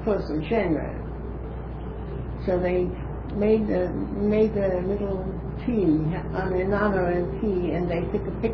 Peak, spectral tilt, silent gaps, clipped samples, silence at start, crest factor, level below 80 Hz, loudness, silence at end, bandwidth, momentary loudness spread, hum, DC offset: -8 dBFS; -10.5 dB/octave; none; under 0.1%; 0 s; 16 dB; -36 dBFS; -26 LUFS; 0 s; 5.4 kHz; 12 LU; none; under 0.1%